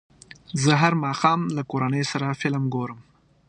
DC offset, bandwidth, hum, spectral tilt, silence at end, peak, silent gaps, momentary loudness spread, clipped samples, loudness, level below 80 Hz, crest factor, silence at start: under 0.1%; 9.8 kHz; none; -5.5 dB/octave; 0.45 s; -4 dBFS; none; 9 LU; under 0.1%; -23 LUFS; -62 dBFS; 22 dB; 0.5 s